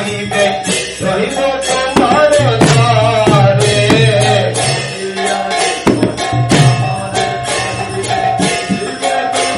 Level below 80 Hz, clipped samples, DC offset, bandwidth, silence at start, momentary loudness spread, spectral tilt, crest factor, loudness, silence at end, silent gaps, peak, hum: -38 dBFS; 0.2%; under 0.1%; 12 kHz; 0 s; 7 LU; -4.5 dB/octave; 12 dB; -12 LUFS; 0 s; none; 0 dBFS; none